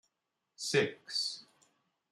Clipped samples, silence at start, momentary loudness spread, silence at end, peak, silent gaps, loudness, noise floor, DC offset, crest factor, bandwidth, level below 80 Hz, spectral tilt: under 0.1%; 0.6 s; 10 LU; 0.7 s; -16 dBFS; none; -34 LUFS; -86 dBFS; under 0.1%; 22 dB; 12.5 kHz; -82 dBFS; -3 dB/octave